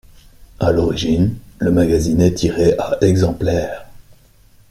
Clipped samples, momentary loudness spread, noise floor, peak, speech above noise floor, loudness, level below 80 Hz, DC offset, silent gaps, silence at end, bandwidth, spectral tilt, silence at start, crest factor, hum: under 0.1%; 7 LU; -48 dBFS; -2 dBFS; 33 dB; -16 LUFS; -36 dBFS; under 0.1%; none; 0.7 s; 15 kHz; -7 dB/octave; 0.4 s; 16 dB; none